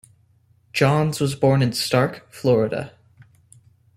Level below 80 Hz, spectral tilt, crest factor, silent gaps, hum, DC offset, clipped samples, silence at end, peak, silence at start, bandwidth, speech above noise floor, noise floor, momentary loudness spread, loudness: -56 dBFS; -6 dB/octave; 18 dB; none; none; under 0.1%; under 0.1%; 1.1 s; -4 dBFS; 0.75 s; 15 kHz; 39 dB; -59 dBFS; 9 LU; -21 LUFS